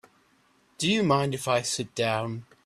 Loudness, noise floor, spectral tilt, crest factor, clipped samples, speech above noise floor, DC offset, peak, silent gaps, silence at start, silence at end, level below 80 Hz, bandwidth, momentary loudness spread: -26 LUFS; -64 dBFS; -4.5 dB/octave; 20 dB; under 0.1%; 38 dB; under 0.1%; -8 dBFS; none; 0.8 s; 0.2 s; -64 dBFS; 14.5 kHz; 7 LU